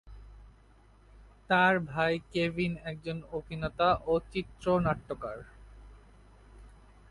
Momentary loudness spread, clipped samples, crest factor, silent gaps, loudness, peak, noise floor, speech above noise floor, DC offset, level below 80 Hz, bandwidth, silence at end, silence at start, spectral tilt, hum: 14 LU; under 0.1%; 20 dB; none; -30 LUFS; -12 dBFS; -59 dBFS; 29 dB; under 0.1%; -52 dBFS; 11.5 kHz; 0.4 s; 0.05 s; -7 dB/octave; none